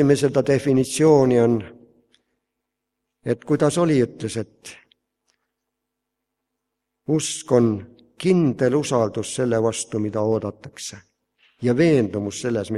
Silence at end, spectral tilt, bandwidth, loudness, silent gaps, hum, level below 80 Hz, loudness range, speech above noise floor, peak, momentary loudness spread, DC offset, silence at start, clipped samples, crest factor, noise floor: 0 s; -6 dB/octave; 13 kHz; -20 LUFS; none; none; -58 dBFS; 6 LU; 61 dB; -2 dBFS; 16 LU; under 0.1%; 0 s; under 0.1%; 20 dB; -81 dBFS